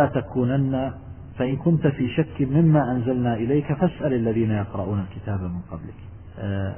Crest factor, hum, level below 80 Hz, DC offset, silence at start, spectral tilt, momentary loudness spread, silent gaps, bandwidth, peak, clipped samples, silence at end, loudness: 16 dB; none; -44 dBFS; 0.2%; 0 s; -12.5 dB/octave; 16 LU; none; 3.3 kHz; -6 dBFS; under 0.1%; 0 s; -23 LUFS